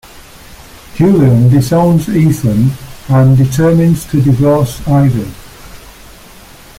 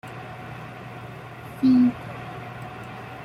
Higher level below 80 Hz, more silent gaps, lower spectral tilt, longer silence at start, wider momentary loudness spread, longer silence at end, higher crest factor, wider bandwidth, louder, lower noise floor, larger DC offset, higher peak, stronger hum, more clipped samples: first, -34 dBFS vs -58 dBFS; neither; about the same, -8 dB/octave vs -7.5 dB/octave; about the same, 0.15 s vs 0.05 s; second, 7 LU vs 20 LU; first, 0.9 s vs 0 s; second, 10 dB vs 16 dB; first, 16 kHz vs 12 kHz; first, -10 LUFS vs -23 LUFS; about the same, -36 dBFS vs -39 dBFS; neither; first, -2 dBFS vs -10 dBFS; neither; neither